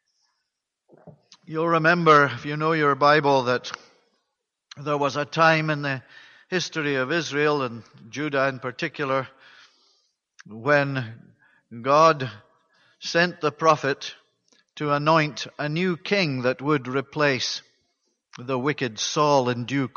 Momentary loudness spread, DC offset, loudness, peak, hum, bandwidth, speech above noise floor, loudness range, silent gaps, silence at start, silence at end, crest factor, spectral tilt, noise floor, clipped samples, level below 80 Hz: 14 LU; under 0.1%; -23 LUFS; -4 dBFS; none; 7.2 kHz; 58 dB; 6 LU; none; 1.05 s; 0.1 s; 20 dB; -5 dB/octave; -81 dBFS; under 0.1%; -70 dBFS